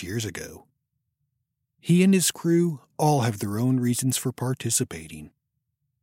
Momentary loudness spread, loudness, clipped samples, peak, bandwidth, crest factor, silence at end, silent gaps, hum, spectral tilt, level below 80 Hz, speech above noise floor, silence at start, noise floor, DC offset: 18 LU; -24 LUFS; under 0.1%; -8 dBFS; 16.5 kHz; 18 dB; 0.75 s; none; none; -5 dB/octave; -62 dBFS; 55 dB; 0 s; -79 dBFS; under 0.1%